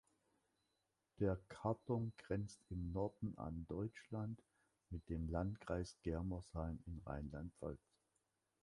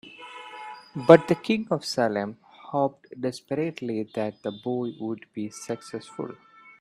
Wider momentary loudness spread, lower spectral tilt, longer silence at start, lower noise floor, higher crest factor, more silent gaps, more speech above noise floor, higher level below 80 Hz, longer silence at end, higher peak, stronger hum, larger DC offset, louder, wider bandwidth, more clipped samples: second, 9 LU vs 22 LU; first, -8 dB/octave vs -6 dB/octave; first, 1.2 s vs 0.05 s; first, -87 dBFS vs -43 dBFS; second, 20 dB vs 26 dB; neither; first, 42 dB vs 18 dB; first, -58 dBFS vs -70 dBFS; first, 0.9 s vs 0.45 s; second, -26 dBFS vs 0 dBFS; neither; neither; second, -47 LUFS vs -26 LUFS; second, 11.5 kHz vs 13 kHz; neither